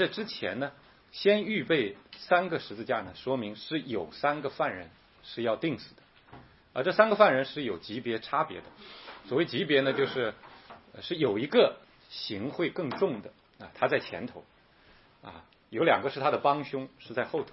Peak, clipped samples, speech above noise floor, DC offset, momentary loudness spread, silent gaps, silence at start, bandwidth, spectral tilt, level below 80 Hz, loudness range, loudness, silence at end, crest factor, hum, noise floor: -6 dBFS; under 0.1%; 30 dB; under 0.1%; 20 LU; none; 0 s; 5.8 kHz; -8.5 dB/octave; -70 dBFS; 5 LU; -29 LUFS; 0 s; 26 dB; none; -60 dBFS